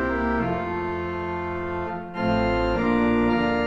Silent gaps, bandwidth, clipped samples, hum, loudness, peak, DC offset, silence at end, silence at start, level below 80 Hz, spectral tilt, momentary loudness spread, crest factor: none; 7.4 kHz; under 0.1%; none; -24 LUFS; -10 dBFS; under 0.1%; 0 s; 0 s; -38 dBFS; -8 dB/octave; 8 LU; 14 dB